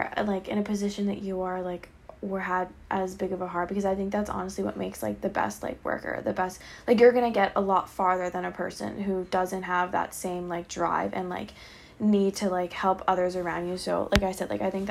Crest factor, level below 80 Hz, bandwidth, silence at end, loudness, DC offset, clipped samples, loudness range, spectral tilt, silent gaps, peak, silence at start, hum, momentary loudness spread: 26 dB; -50 dBFS; 15 kHz; 0 s; -28 LUFS; under 0.1%; under 0.1%; 5 LU; -5.5 dB/octave; none; -2 dBFS; 0 s; none; 9 LU